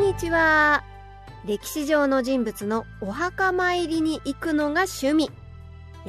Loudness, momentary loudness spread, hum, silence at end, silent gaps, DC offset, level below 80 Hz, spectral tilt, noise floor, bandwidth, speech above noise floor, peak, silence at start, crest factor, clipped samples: -23 LUFS; 12 LU; none; 0 s; none; under 0.1%; -46 dBFS; -4.5 dB/octave; -42 dBFS; 13.5 kHz; 19 dB; -8 dBFS; 0 s; 16 dB; under 0.1%